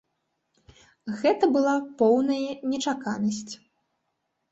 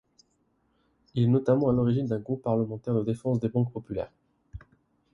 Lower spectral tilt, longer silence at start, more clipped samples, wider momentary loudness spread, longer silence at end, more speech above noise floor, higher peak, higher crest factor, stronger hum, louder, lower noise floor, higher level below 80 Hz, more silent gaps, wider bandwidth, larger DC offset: second, -5 dB/octave vs -10 dB/octave; about the same, 1.05 s vs 1.15 s; neither; first, 16 LU vs 12 LU; first, 0.95 s vs 0.55 s; first, 53 dB vs 45 dB; about the same, -8 dBFS vs -10 dBFS; about the same, 18 dB vs 18 dB; neither; about the same, -25 LUFS vs -27 LUFS; first, -78 dBFS vs -71 dBFS; second, -68 dBFS vs -56 dBFS; neither; second, 8.2 kHz vs 10.5 kHz; neither